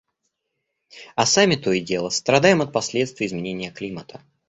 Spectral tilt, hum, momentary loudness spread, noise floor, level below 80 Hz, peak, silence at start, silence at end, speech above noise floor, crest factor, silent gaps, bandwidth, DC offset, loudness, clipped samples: -3.5 dB/octave; none; 14 LU; -78 dBFS; -58 dBFS; -2 dBFS; 0.95 s; 0.35 s; 57 dB; 20 dB; none; 8.2 kHz; under 0.1%; -20 LUFS; under 0.1%